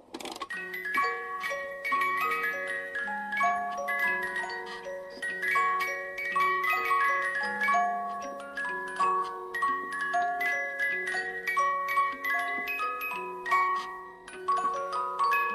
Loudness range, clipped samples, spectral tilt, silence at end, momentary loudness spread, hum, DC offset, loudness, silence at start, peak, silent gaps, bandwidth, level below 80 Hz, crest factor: 3 LU; under 0.1%; -2.5 dB/octave; 0 s; 10 LU; none; under 0.1%; -29 LUFS; 0.1 s; -14 dBFS; none; 14.5 kHz; -70 dBFS; 16 dB